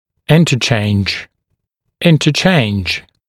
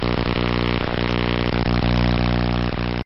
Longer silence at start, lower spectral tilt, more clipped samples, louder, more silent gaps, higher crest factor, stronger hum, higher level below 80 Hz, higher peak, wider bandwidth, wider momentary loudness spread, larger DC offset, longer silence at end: first, 0.3 s vs 0 s; second, -5.5 dB/octave vs -8.5 dB/octave; neither; first, -13 LUFS vs -21 LUFS; neither; about the same, 14 dB vs 12 dB; second, none vs 60 Hz at -20 dBFS; second, -44 dBFS vs -26 dBFS; first, 0 dBFS vs -8 dBFS; first, 14 kHz vs 6 kHz; first, 8 LU vs 3 LU; second, under 0.1% vs 1%; first, 0.3 s vs 0 s